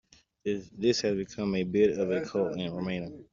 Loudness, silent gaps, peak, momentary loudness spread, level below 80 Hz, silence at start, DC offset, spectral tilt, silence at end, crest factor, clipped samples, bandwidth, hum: -30 LUFS; none; -12 dBFS; 9 LU; -62 dBFS; 0.45 s; under 0.1%; -5.5 dB/octave; 0.1 s; 18 dB; under 0.1%; 7.4 kHz; none